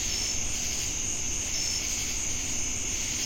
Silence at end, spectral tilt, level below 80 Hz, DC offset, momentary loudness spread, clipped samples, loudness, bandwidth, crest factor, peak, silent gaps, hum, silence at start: 0 s; -0.5 dB/octave; -40 dBFS; under 0.1%; 2 LU; under 0.1%; -28 LUFS; 16.5 kHz; 12 dB; -16 dBFS; none; none; 0 s